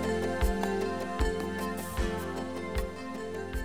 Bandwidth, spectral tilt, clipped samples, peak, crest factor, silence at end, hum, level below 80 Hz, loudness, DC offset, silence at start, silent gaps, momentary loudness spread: over 20 kHz; -5.5 dB/octave; under 0.1%; -16 dBFS; 16 dB; 0 s; none; -38 dBFS; -33 LUFS; 0.4%; 0 s; none; 7 LU